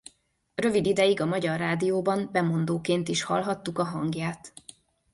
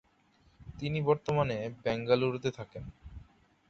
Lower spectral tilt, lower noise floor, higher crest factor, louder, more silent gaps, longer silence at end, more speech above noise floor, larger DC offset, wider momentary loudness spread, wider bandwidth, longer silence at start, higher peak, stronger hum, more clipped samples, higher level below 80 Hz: second, -5.5 dB/octave vs -7 dB/octave; second, -63 dBFS vs -67 dBFS; about the same, 16 dB vs 20 dB; first, -27 LUFS vs -31 LUFS; neither; first, 0.65 s vs 0.45 s; about the same, 37 dB vs 36 dB; neither; second, 10 LU vs 21 LU; first, 11.5 kHz vs 7.6 kHz; about the same, 0.6 s vs 0.6 s; about the same, -10 dBFS vs -12 dBFS; neither; neither; second, -62 dBFS vs -56 dBFS